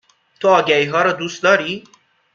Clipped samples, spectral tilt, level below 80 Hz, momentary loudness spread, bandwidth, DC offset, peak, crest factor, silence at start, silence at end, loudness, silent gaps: under 0.1%; -4 dB/octave; -62 dBFS; 9 LU; 7.6 kHz; under 0.1%; 0 dBFS; 16 dB; 0.4 s; 0.55 s; -16 LUFS; none